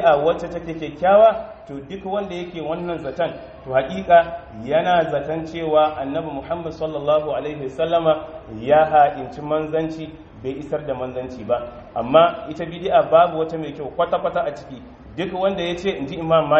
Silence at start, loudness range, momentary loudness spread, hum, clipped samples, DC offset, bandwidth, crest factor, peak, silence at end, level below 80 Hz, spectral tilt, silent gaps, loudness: 0 s; 3 LU; 15 LU; none; under 0.1%; under 0.1%; 7.4 kHz; 20 dB; 0 dBFS; 0 s; -48 dBFS; -4 dB/octave; none; -20 LUFS